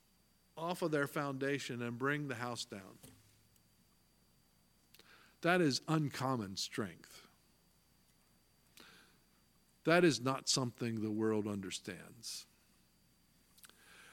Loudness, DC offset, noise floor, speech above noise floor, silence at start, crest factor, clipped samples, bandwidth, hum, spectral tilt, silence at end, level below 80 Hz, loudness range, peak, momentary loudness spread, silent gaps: -37 LUFS; under 0.1%; -72 dBFS; 35 dB; 0.55 s; 26 dB; under 0.1%; 17.5 kHz; none; -4.5 dB/octave; 0 s; -78 dBFS; 10 LU; -14 dBFS; 16 LU; none